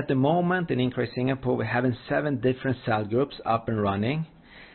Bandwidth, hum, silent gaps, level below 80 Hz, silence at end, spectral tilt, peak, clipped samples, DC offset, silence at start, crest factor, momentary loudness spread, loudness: 4.4 kHz; none; none; -56 dBFS; 0.1 s; -11.5 dB/octave; -10 dBFS; under 0.1%; under 0.1%; 0 s; 16 dB; 4 LU; -26 LUFS